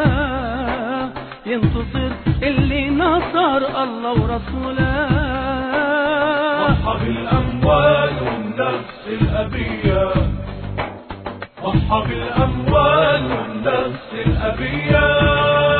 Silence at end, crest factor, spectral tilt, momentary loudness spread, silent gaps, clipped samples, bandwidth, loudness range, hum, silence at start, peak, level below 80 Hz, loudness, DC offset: 0 s; 16 dB; -10 dB/octave; 10 LU; none; under 0.1%; 4.5 kHz; 4 LU; none; 0 s; -2 dBFS; -28 dBFS; -18 LUFS; under 0.1%